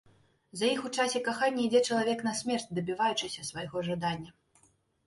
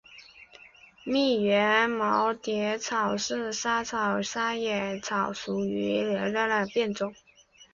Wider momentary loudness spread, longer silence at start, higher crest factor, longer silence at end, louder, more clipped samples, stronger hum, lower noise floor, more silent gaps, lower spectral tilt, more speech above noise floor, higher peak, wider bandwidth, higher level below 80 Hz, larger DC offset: first, 10 LU vs 7 LU; first, 0.55 s vs 0.1 s; about the same, 18 dB vs 18 dB; first, 0.75 s vs 0.1 s; second, -31 LUFS vs -27 LUFS; neither; neither; first, -68 dBFS vs -53 dBFS; neither; about the same, -4 dB/octave vs -4 dB/octave; first, 37 dB vs 26 dB; second, -14 dBFS vs -10 dBFS; first, 11.5 kHz vs 7.6 kHz; about the same, -68 dBFS vs -64 dBFS; neither